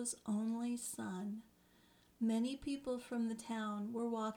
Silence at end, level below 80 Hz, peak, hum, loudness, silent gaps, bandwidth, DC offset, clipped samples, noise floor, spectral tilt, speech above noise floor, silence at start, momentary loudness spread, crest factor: 0 s; -72 dBFS; -28 dBFS; 60 Hz at -75 dBFS; -41 LUFS; none; 17.5 kHz; under 0.1%; under 0.1%; -69 dBFS; -4.5 dB/octave; 29 dB; 0 s; 6 LU; 14 dB